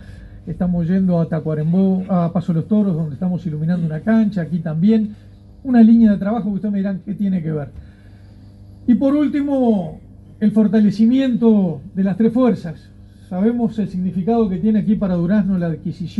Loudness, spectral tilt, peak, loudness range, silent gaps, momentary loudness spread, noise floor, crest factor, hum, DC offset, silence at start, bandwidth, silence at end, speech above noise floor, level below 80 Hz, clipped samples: -17 LUFS; -10 dB/octave; -2 dBFS; 4 LU; none; 9 LU; -41 dBFS; 16 dB; none; under 0.1%; 0 s; 5.2 kHz; 0 s; 25 dB; -44 dBFS; under 0.1%